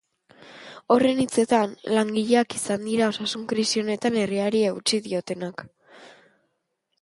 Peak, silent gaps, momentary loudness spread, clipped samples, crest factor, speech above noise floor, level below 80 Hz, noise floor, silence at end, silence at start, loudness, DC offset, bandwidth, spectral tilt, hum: -4 dBFS; none; 11 LU; under 0.1%; 20 dB; 53 dB; -66 dBFS; -76 dBFS; 0.95 s; 0.4 s; -23 LUFS; under 0.1%; 11.5 kHz; -4 dB/octave; none